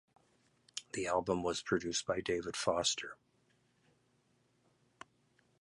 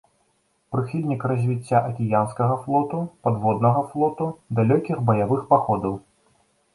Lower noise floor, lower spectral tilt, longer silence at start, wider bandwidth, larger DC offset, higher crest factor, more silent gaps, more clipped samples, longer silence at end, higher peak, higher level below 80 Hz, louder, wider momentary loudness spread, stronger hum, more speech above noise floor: first, -75 dBFS vs -67 dBFS; second, -3 dB/octave vs -9.5 dB/octave; about the same, 0.75 s vs 0.7 s; about the same, 11.5 kHz vs 11.5 kHz; neither; about the same, 22 dB vs 20 dB; neither; neither; first, 2.45 s vs 0.75 s; second, -16 dBFS vs -4 dBFS; second, -66 dBFS vs -56 dBFS; second, -36 LUFS vs -23 LUFS; first, 12 LU vs 7 LU; first, 60 Hz at -75 dBFS vs none; second, 39 dB vs 46 dB